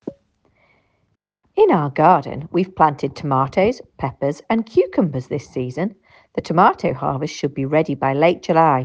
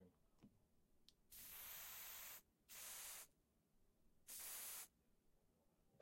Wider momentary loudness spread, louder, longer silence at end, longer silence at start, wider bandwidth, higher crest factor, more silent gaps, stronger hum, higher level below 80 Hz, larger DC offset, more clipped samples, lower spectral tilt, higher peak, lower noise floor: about the same, 12 LU vs 11 LU; first, -19 LUFS vs -55 LUFS; about the same, 0 s vs 0 s; about the same, 0.05 s vs 0 s; second, 8.2 kHz vs 16.5 kHz; about the same, 18 dB vs 18 dB; neither; neither; first, -54 dBFS vs -82 dBFS; neither; neither; first, -7.5 dB/octave vs 0.5 dB/octave; first, 0 dBFS vs -42 dBFS; second, -68 dBFS vs -81 dBFS